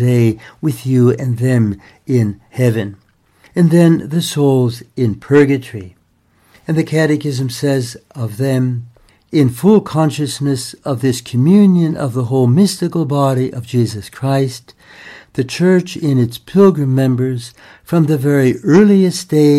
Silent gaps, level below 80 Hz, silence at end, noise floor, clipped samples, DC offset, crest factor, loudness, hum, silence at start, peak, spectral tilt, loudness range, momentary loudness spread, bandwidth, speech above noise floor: none; -52 dBFS; 0 s; -55 dBFS; under 0.1%; under 0.1%; 14 dB; -14 LUFS; none; 0 s; 0 dBFS; -7 dB/octave; 4 LU; 11 LU; 14.5 kHz; 42 dB